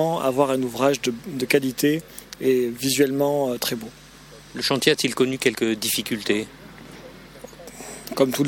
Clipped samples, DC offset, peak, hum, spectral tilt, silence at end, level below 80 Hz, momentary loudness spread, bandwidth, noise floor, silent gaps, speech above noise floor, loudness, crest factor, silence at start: under 0.1%; under 0.1%; -4 dBFS; none; -4 dB/octave; 0 s; -56 dBFS; 21 LU; 18 kHz; -45 dBFS; none; 23 dB; -22 LUFS; 20 dB; 0 s